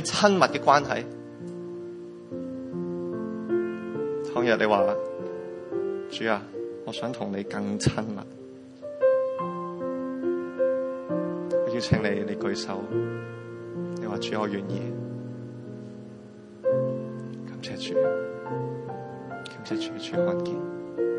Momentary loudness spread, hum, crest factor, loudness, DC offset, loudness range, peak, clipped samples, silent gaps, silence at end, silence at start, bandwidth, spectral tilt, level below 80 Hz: 16 LU; none; 26 dB; -28 LUFS; under 0.1%; 5 LU; -4 dBFS; under 0.1%; none; 0 s; 0 s; 11 kHz; -5.5 dB/octave; -60 dBFS